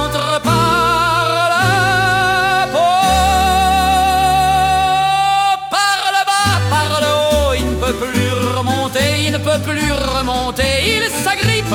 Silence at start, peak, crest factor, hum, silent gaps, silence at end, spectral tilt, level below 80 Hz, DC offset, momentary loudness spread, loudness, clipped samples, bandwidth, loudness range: 0 s; 0 dBFS; 14 dB; none; none; 0 s; -4 dB/octave; -30 dBFS; under 0.1%; 4 LU; -14 LUFS; under 0.1%; 18 kHz; 3 LU